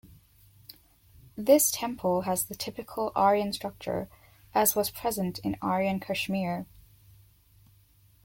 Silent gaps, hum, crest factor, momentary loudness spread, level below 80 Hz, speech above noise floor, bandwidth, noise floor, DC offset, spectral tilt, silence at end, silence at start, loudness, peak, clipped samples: none; none; 22 dB; 12 LU; -60 dBFS; 33 dB; 17 kHz; -61 dBFS; under 0.1%; -4 dB/octave; 1.6 s; 1.35 s; -28 LUFS; -8 dBFS; under 0.1%